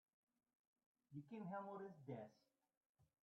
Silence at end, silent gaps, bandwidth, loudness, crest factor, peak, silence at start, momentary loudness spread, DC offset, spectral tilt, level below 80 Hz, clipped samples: 0.2 s; 2.77-2.95 s; 6.4 kHz; -55 LUFS; 18 dB; -40 dBFS; 1.1 s; 9 LU; under 0.1%; -8 dB/octave; under -90 dBFS; under 0.1%